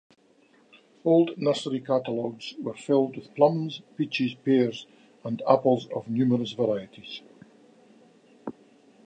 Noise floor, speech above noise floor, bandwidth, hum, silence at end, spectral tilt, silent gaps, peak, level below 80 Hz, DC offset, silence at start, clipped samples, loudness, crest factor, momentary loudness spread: -61 dBFS; 35 dB; 9 kHz; none; 0.55 s; -7 dB/octave; none; -4 dBFS; -76 dBFS; under 0.1%; 1.05 s; under 0.1%; -26 LUFS; 22 dB; 18 LU